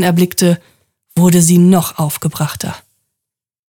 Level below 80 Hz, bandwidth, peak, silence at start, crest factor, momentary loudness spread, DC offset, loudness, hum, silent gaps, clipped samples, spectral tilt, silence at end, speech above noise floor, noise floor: -52 dBFS; 19 kHz; 0 dBFS; 0 s; 14 dB; 14 LU; under 0.1%; -13 LUFS; none; none; under 0.1%; -5.5 dB/octave; 1 s; 69 dB; -81 dBFS